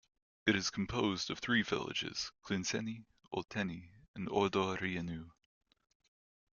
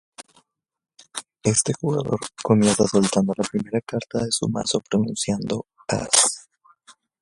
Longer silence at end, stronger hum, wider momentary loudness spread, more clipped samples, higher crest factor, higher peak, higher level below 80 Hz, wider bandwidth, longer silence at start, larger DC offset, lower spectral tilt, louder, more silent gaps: first, 1.25 s vs 0.3 s; neither; about the same, 12 LU vs 11 LU; neither; about the same, 22 dB vs 22 dB; second, -16 dBFS vs -2 dBFS; second, -66 dBFS vs -56 dBFS; second, 7.4 kHz vs 11.5 kHz; first, 0.45 s vs 0.2 s; neither; about the same, -4 dB/octave vs -4 dB/octave; second, -37 LUFS vs -22 LUFS; first, 4.08-4.14 s vs none